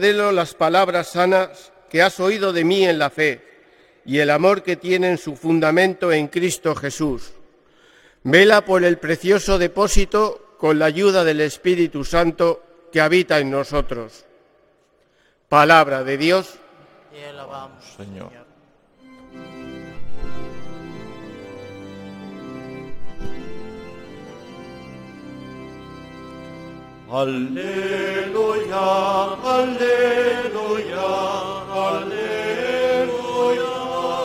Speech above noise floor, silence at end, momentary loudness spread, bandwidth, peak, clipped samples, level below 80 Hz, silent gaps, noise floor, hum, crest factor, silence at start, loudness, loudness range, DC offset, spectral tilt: 42 dB; 0 s; 22 LU; 16.5 kHz; 0 dBFS; under 0.1%; -36 dBFS; none; -60 dBFS; none; 20 dB; 0 s; -19 LUFS; 19 LU; under 0.1%; -4.5 dB/octave